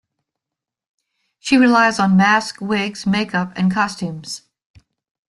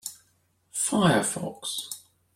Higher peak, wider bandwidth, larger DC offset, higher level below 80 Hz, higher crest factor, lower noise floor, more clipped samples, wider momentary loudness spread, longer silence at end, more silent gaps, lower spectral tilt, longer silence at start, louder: first, -2 dBFS vs -8 dBFS; second, 11.5 kHz vs 16.5 kHz; neither; first, -56 dBFS vs -64 dBFS; about the same, 18 dB vs 20 dB; first, -85 dBFS vs -68 dBFS; neither; about the same, 16 LU vs 17 LU; first, 0.9 s vs 0.35 s; neither; about the same, -5 dB/octave vs -4 dB/octave; first, 1.45 s vs 0.05 s; first, -17 LUFS vs -26 LUFS